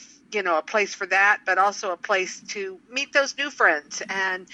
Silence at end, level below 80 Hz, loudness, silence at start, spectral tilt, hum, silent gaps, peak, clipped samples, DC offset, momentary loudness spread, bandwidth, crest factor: 0 s; -76 dBFS; -23 LUFS; 0 s; -1 dB/octave; none; none; -4 dBFS; under 0.1%; under 0.1%; 11 LU; 11 kHz; 20 dB